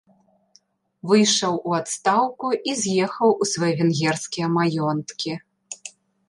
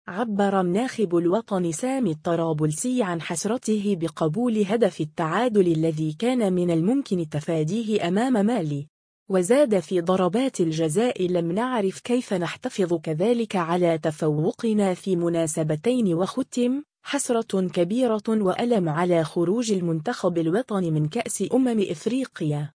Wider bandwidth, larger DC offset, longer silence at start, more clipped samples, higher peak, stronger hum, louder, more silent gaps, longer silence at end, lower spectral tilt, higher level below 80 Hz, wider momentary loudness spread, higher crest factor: about the same, 11.5 kHz vs 10.5 kHz; neither; first, 1.05 s vs 0.05 s; neither; about the same, -6 dBFS vs -8 dBFS; neither; first, -21 LUFS vs -24 LUFS; second, none vs 8.89-9.26 s; first, 0.4 s vs 0.05 s; second, -4 dB/octave vs -6 dB/octave; about the same, -68 dBFS vs -66 dBFS; first, 18 LU vs 5 LU; about the same, 18 dB vs 16 dB